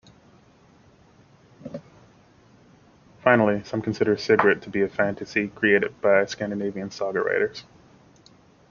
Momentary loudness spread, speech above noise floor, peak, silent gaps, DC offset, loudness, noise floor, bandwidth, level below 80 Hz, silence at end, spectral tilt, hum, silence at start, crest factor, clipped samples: 20 LU; 33 dB; -2 dBFS; none; under 0.1%; -23 LUFS; -55 dBFS; 7.2 kHz; -64 dBFS; 1.1 s; -6 dB/octave; none; 1.6 s; 24 dB; under 0.1%